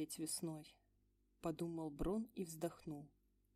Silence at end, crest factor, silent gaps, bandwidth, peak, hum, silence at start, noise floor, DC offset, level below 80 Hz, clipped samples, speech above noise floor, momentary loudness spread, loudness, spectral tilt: 0.5 s; 18 dB; none; 15.5 kHz; -30 dBFS; none; 0 s; -78 dBFS; under 0.1%; -62 dBFS; under 0.1%; 33 dB; 12 LU; -46 LUFS; -5 dB/octave